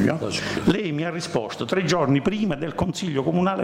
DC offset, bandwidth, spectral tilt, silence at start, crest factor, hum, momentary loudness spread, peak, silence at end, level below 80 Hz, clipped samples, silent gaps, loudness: under 0.1%; 15.5 kHz; -5.5 dB/octave; 0 s; 14 dB; none; 6 LU; -8 dBFS; 0 s; -48 dBFS; under 0.1%; none; -24 LUFS